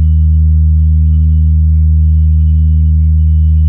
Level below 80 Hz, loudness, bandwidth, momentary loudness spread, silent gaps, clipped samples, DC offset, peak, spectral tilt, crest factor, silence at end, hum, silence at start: -10 dBFS; -10 LUFS; 0.4 kHz; 0 LU; none; under 0.1%; under 0.1%; -2 dBFS; -15 dB/octave; 4 dB; 0 s; none; 0 s